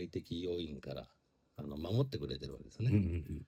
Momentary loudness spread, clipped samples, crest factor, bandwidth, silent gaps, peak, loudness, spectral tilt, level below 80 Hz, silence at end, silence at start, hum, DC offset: 15 LU; under 0.1%; 20 dB; 15 kHz; none; -18 dBFS; -39 LUFS; -8 dB/octave; -56 dBFS; 0 s; 0 s; none; under 0.1%